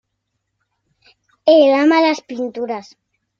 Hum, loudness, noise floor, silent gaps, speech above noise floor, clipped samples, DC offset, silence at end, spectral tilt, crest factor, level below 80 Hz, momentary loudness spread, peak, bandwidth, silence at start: none; -15 LUFS; -74 dBFS; none; 60 dB; under 0.1%; under 0.1%; 0.6 s; -4 dB/octave; 16 dB; -68 dBFS; 15 LU; -2 dBFS; 7.4 kHz; 1.45 s